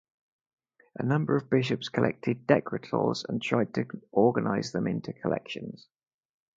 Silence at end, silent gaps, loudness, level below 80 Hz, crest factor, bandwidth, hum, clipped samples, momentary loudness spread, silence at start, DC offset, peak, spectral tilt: 0.8 s; none; -29 LUFS; -66 dBFS; 24 dB; 7.8 kHz; none; under 0.1%; 9 LU; 1 s; under 0.1%; -6 dBFS; -7 dB/octave